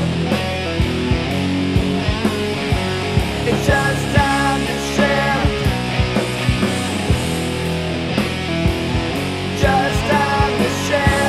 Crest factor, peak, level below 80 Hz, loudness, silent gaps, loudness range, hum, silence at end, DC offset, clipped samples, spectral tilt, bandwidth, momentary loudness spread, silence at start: 18 dB; 0 dBFS; -28 dBFS; -18 LUFS; none; 2 LU; none; 0 s; under 0.1%; under 0.1%; -5.5 dB/octave; 15 kHz; 5 LU; 0 s